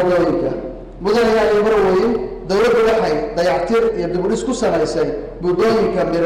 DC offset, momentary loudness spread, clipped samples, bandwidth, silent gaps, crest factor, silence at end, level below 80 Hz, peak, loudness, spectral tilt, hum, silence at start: under 0.1%; 8 LU; under 0.1%; 13 kHz; none; 6 dB; 0 s; -38 dBFS; -10 dBFS; -17 LUFS; -5.5 dB/octave; none; 0 s